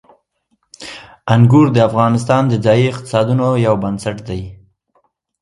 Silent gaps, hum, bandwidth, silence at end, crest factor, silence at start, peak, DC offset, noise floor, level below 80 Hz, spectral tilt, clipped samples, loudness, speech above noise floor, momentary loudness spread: none; none; 11.5 kHz; 0.85 s; 14 dB; 0.8 s; 0 dBFS; under 0.1%; -65 dBFS; -44 dBFS; -7.5 dB/octave; under 0.1%; -14 LUFS; 52 dB; 21 LU